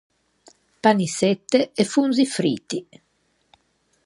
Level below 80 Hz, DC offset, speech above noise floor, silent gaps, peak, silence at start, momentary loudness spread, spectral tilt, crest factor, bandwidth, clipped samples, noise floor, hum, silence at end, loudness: -68 dBFS; under 0.1%; 47 dB; none; -4 dBFS; 0.85 s; 8 LU; -5 dB/octave; 20 dB; 11.5 kHz; under 0.1%; -67 dBFS; none; 1.25 s; -21 LUFS